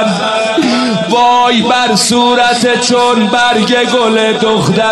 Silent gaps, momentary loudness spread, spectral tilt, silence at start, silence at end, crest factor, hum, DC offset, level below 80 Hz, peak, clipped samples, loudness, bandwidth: none; 3 LU; -3.5 dB/octave; 0 s; 0 s; 10 dB; none; under 0.1%; -50 dBFS; 0 dBFS; under 0.1%; -9 LUFS; 12.5 kHz